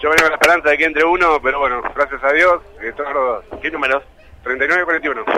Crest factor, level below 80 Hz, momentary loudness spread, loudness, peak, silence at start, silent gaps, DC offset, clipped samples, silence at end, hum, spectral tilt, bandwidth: 14 dB; -42 dBFS; 11 LU; -15 LUFS; -2 dBFS; 0 s; none; under 0.1%; under 0.1%; 0 s; none; -3 dB/octave; 16 kHz